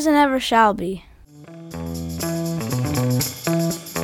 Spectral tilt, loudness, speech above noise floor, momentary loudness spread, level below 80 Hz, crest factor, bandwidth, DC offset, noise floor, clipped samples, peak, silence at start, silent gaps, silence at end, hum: -5 dB/octave; -21 LUFS; 25 dB; 15 LU; -46 dBFS; 18 dB; 19 kHz; under 0.1%; -42 dBFS; under 0.1%; -4 dBFS; 0 s; none; 0 s; none